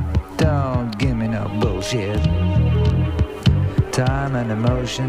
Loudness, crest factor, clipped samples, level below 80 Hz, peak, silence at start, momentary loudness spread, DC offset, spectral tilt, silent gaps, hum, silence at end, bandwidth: -20 LUFS; 16 dB; under 0.1%; -28 dBFS; -2 dBFS; 0 s; 4 LU; under 0.1%; -6.5 dB/octave; none; none; 0 s; 14.5 kHz